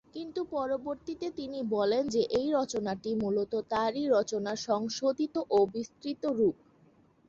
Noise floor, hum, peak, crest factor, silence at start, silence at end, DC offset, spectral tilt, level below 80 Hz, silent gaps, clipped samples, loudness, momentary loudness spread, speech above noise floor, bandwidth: -63 dBFS; none; -16 dBFS; 16 dB; 0.15 s; 0.75 s; under 0.1%; -5 dB/octave; -66 dBFS; none; under 0.1%; -31 LUFS; 9 LU; 33 dB; 7.8 kHz